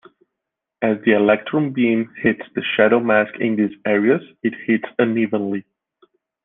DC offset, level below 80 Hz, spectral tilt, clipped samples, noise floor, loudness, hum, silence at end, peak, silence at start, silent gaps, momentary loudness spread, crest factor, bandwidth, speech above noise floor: under 0.1%; -60 dBFS; -9.5 dB/octave; under 0.1%; -82 dBFS; -19 LUFS; none; 0.85 s; -2 dBFS; 0.8 s; none; 8 LU; 18 dB; 3.9 kHz; 64 dB